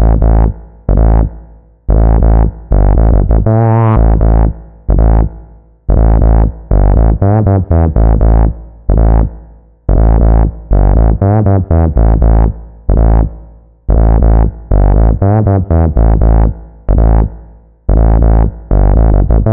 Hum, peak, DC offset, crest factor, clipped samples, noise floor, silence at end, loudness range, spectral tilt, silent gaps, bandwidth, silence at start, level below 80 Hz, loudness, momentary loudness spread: none; 0 dBFS; 3%; 8 dB; under 0.1%; -36 dBFS; 0 s; 1 LU; -14.5 dB/octave; none; 2.4 kHz; 0 s; -10 dBFS; -11 LUFS; 7 LU